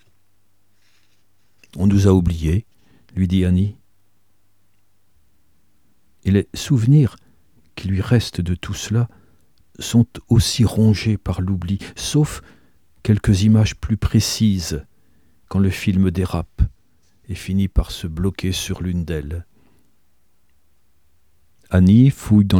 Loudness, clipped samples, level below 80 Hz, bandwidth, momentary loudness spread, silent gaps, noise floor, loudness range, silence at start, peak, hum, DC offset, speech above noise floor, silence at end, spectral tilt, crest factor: -19 LUFS; under 0.1%; -34 dBFS; 16.5 kHz; 13 LU; none; -66 dBFS; 6 LU; 1.75 s; -2 dBFS; none; 0.2%; 49 dB; 0 s; -6.5 dB/octave; 18 dB